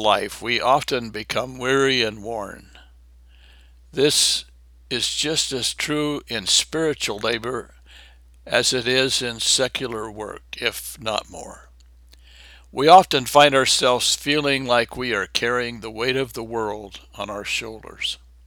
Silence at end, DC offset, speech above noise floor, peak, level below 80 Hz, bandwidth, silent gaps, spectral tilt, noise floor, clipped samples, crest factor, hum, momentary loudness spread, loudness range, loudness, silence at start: 0.3 s; under 0.1%; 28 dB; 0 dBFS; -50 dBFS; over 20 kHz; none; -2 dB/octave; -49 dBFS; under 0.1%; 22 dB; none; 16 LU; 8 LU; -20 LUFS; 0 s